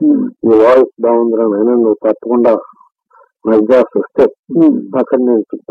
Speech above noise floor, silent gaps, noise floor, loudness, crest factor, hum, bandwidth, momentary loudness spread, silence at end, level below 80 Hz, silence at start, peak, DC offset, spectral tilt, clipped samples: 39 dB; 4.39-4.43 s; -49 dBFS; -11 LUFS; 12 dB; none; 5.8 kHz; 6 LU; 0.15 s; -54 dBFS; 0 s; 0 dBFS; under 0.1%; -9 dB/octave; under 0.1%